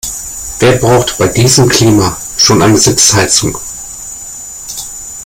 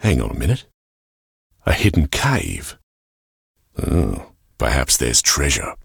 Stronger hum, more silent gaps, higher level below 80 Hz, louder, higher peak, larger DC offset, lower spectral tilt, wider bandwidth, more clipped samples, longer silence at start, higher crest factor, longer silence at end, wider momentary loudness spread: neither; second, none vs 0.74-1.50 s, 2.83-3.54 s; second, -34 dBFS vs -28 dBFS; first, -8 LUFS vs -18 LUFS; about the same, 0 dBFS vs -2 dBFS; neither; about the same, -3.5 dB/octave vs -3.5 dB/octave; about the same, over 20 kHz vs over 20 kHz; first, 0.2% vs under 0.1%; about the same, 0.05 s vs 0 s; second, 10 dB vs 18 dB; about the same, 0 s vs 0.05 s; first, 17 LU vs 14 LU